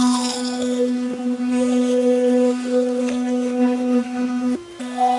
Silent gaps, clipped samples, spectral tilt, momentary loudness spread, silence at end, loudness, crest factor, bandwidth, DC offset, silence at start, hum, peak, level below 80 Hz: none; under 0.1%; -3.5 dB/octave; 6 LU; 0 s; -20 LUFS; 12 dB; 11.5 kHz; under 0.1%; 0 s; none; -8 dBFS; -64 dBFS